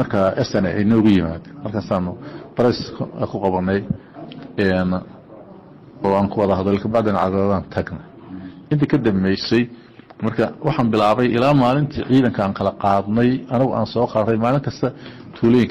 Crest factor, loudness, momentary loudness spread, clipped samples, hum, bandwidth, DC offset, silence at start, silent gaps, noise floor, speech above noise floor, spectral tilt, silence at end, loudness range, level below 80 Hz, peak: 12 dB; -19 LUFS; 13 LU; under 0.1%; none; 8.6 kHz; under 0.1%; 0 s; none; -42 dBFS; 24 dB; -8 dB/octave; 0 s; 5 LU; -46 dBFS; -6 dBFS